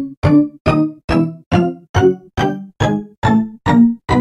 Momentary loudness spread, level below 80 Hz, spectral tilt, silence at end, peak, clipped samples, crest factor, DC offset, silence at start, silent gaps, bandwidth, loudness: 7 LU; -34 dBFS; -7.5 dB/octave; 0 s; 0 dBFS; under 0.1%; 14 dB; under 0.1%; 0 s; 0.17-0.22 s, 0.60-0.65 s, 1.04-1.08 s, 1.46-1.51 s, 1.89-1.94 s, 3.18-3.22 s; 10.5 kHz; -16 LUFS